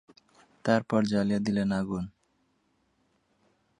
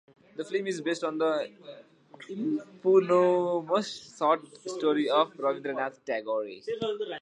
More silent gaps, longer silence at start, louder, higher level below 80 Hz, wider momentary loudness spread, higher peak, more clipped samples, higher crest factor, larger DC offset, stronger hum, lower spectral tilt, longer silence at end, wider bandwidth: neither; first, 0.65 s vs 0.35 s; about the same, -28 LUFS vs -28 LUFS; first, -60 dBFS vs -80 dBFS; second, 10 LU vs 15 LU; about the same, -10 dBFS vs -10 dBFS; neither; about the same, 22 dB vs 18 dB; neither; neither; first, -7 dB/octave vs -5 dB/octave; first, 1.7 s vs 0 s; about the same, 10.5 kHz vs 10 kHz